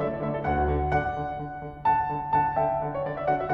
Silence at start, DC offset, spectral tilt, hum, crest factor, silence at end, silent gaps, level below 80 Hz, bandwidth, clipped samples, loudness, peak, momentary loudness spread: 0 s; under 0.1%; -9.5 dB/octave; none; 14 dB; 0 s; none; -40 dBFS; 6.6 kHz; under 0.1%; -27 LUFS; -12 dBFS; 7 LU